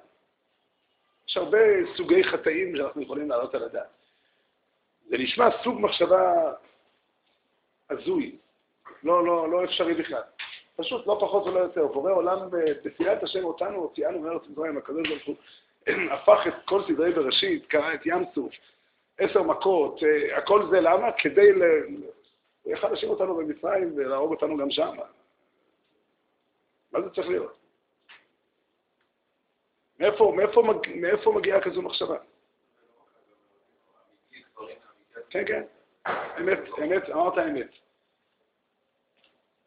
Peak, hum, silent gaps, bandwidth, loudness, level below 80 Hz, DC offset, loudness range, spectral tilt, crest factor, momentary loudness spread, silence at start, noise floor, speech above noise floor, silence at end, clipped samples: -4 dBFS; none; none; 5 kHz; -25 LUFS; -68 dBFS; under 0.1%; 13 LU; -2 dB/octave; 22 dB; 14 LU; 1.3 s; -75 dBFS; 51 dB; 2 s; under 0.1%